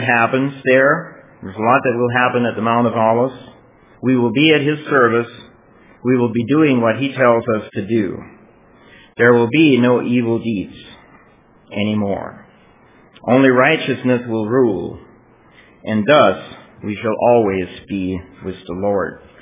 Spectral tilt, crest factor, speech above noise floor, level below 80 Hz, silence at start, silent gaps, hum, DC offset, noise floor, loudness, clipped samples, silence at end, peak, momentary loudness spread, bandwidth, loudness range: -10.5 dB/octave; 16 dB; 34 dB; -50 dBFS; 0 s; none; none; under 0.1%; -49 dBFS; -16 LUFS; under 0.1%; 0.25 s; 0 dBFS; 16 LU; 3.8 kHz; 3 LU